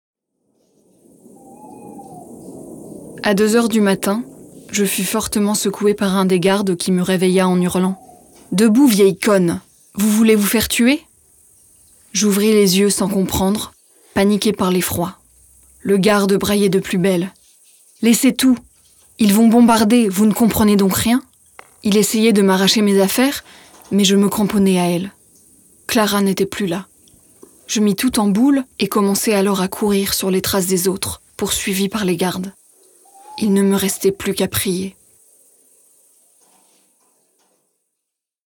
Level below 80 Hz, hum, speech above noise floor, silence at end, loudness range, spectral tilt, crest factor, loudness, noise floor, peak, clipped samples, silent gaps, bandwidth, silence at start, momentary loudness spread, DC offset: -48 dBFS; none; 65 dB; 3.55 s; 6 LU; -4.5 dB/octave; 16 dB; -16 LUFS; -80 dBFS; -2 dBFS; under 0.1%; none; over 20 kHz; 1.65 s; 12 LU; under 0.1%